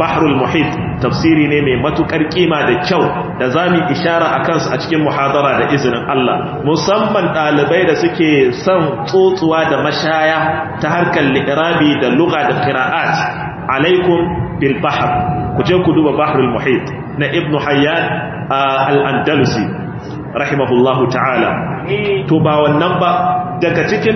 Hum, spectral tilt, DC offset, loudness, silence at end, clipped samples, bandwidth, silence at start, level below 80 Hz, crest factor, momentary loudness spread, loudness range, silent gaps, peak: none; -6.5 dB/octave; under 0.1%; -13 LUFS; 0 s; under 0.1%; 6.4 kHz; 0 s; -42 dBFS; 14 dB; 5 LU; 2 LU; none; 0 dBFS